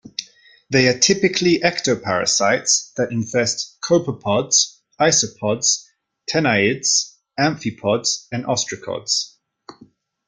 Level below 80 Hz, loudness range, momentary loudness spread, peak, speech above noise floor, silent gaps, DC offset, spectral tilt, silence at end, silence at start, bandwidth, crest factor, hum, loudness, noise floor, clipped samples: -58 dBFS; 3 LU; 9 LU; -2 dBFS; 32 dB; none; under 0.1%; -2.5 dB/octave; 0.55 s; 0.05 s; 11 kHz; 20 dB; none; -18 LUFS; -51 dBFS; under 0.1%